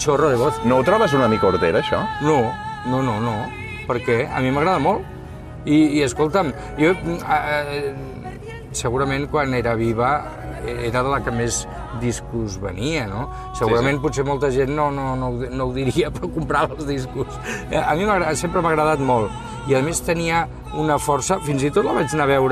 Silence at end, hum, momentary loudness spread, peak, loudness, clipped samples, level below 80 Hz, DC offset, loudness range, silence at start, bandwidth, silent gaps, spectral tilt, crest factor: 0 s; none; 10 LU; -4 dBFS; -20 LUFS; under 0.1%; -38 dBFS; under 0.1%; 3 LU; 0 s; 14.5 kHz; none; -5.5 dB/octave; 16 dB